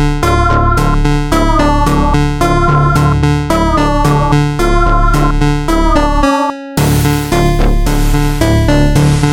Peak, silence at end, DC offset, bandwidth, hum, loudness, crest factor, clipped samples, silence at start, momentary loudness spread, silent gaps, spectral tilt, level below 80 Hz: 0 dBFS; 0 s; under 0.1%; 17.5 kHz; none; -11 LUFS; 10 dB; under 0.1%; 0 s; 3 LU; none; -6 dB/octave; -14 dBFS